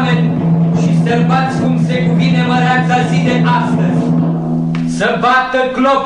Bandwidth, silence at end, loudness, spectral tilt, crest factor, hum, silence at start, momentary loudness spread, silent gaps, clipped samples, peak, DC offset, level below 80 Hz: 9.6 kHz; 0 s; -13 LUFS; -7 dB/octave; 10 dB; none; 0 s; 3 LU; none; under 0.1%; -2 dBFS; 0.2%; -44 dBFS